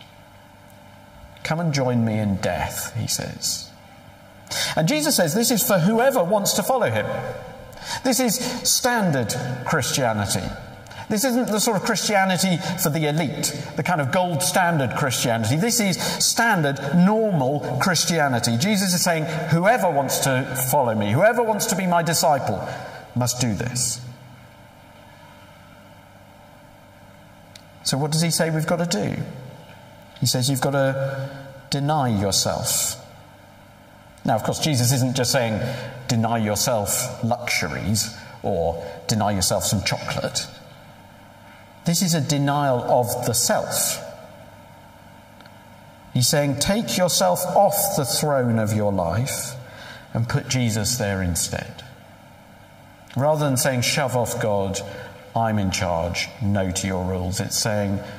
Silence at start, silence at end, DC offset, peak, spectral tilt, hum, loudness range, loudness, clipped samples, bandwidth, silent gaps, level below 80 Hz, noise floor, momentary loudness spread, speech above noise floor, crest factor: 0 s; 0 s; under 0.1%; -6 dBFS; -4 dB/octave; none; 5 LU; -21 LUFS; under 0.1%; 16 kHz; none; -50 dBFS; -47 dBFS; 11 LU; 26 dB; 18 dB